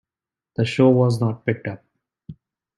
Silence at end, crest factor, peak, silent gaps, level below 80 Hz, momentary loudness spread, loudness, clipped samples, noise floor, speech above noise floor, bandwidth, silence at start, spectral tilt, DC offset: 0.45 s; 18 dB; -4 dBFS; none; -58 dBFS; 17 LU; -20 LUFS; under 0.1%; -90 dBFS; 71 dB; 12 kHz; 0.6 s; -8 dB/octave; under 0.1%